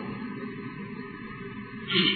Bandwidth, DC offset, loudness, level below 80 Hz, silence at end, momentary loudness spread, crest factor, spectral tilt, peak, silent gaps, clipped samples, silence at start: 4.6 kHz; under 0.1%; -33 LUFS; -60 dBFS; 0 s; 13 LU; 22 dB; -7.5 dB/octave; -10 dBFS; none; under 0.1%; 0 s